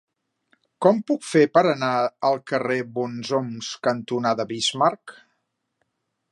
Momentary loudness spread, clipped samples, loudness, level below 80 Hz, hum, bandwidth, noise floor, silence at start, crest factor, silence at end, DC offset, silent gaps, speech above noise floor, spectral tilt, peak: 8 LU; under 0.1%; -22 LUFS; -72 dBFS; none; 11.5 kHz; -75 dBFS; 0.8 s; 20 dB; 1.2 s; under 0.1%; none; 53 dB; -4.5 dB/octave; -2 dBFS